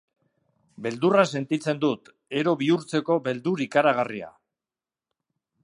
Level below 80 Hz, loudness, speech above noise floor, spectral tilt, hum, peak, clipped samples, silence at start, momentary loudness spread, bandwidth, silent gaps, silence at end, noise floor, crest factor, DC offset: -76 dBFS; -24 LUFS; over 66 dB; -6 dB/octave; none; -4 dBFS; under 0.1%; 0.8 s; 12 LU; 11 kHz; none; 1.35 s; under -90 dBFS; 22 dB; under 0.1%